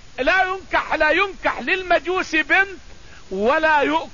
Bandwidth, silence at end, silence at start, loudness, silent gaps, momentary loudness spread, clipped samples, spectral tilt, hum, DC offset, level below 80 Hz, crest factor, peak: 7.4 kHz; 0.05 s; 0 s; -19 LUFS; none; 6 LU; under 0.1%; -3.5 dB/octave; none; 0.8%; -44 dBFS; 16 dB; -4 dBFS